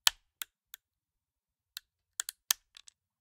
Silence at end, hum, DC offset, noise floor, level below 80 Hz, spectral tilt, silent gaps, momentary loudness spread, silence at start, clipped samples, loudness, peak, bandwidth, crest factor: 0.7 s; none; under 0.1%; under -90 dBFS; -74 dBFS; 4 dB/octave; none; 21 LU; 0.05 s; under 0.1%; -35 LUFS; -2 dBFS; 18 kHz; 38 dB